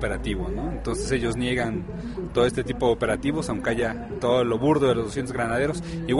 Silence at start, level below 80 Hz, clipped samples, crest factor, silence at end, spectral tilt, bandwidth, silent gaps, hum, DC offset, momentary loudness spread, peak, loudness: 0 s; -38 dBFS; under 0.1%; 16 dB; 0 s; -6 dB/octave; 11.5 kHz; none; none; under 0.1%; 8 LU; -8 dBFS; -25 LUFS